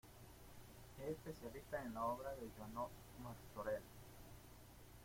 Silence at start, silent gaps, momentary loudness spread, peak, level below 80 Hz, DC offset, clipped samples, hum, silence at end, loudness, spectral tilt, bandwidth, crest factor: 0.05 s; none; 17 LU; -32 dBFS; -66 dBFS; under 0.1%; under 0.1%; none; 0 s; -50 LUFS; -5.5 dB/octave; 16.5 kHz; 18 dB